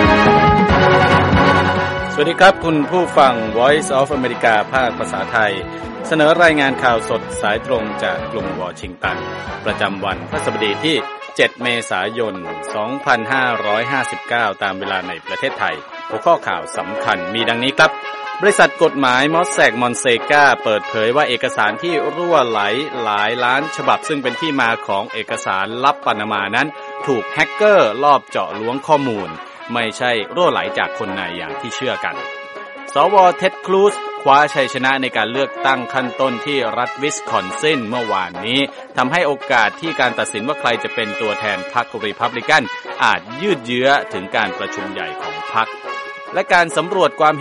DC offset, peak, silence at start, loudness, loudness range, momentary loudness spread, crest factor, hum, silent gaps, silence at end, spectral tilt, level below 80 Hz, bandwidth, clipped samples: under 0.1%; 0 dBFS; 0 s; -16 LUFS; 5 LU; 11 LU; 16 dB; none; none; 0 s; -4.5 dB/octave; -42 dBFS; 11.5 kHz; under 0.1%